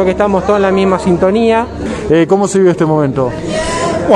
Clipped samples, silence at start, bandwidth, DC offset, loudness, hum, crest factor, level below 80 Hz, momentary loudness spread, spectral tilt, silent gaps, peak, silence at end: under 0.1%; 0 s; 11.5 kHz; under 0.1%; -12 LUFS; none; 12 dB; -32 dBFS; 6 LU; -6 dB/octave; none; 0 dBFS; 0 s